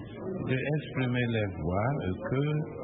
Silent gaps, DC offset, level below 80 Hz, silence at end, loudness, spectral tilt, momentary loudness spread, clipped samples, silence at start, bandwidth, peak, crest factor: none; under 0.1%; -52 dBFS; 0 s; -31 LUFS; -11.5 dB/octave; 3 LU; under 0.1%; 0 s; 4 kHz; -16 dBFS; 14 dB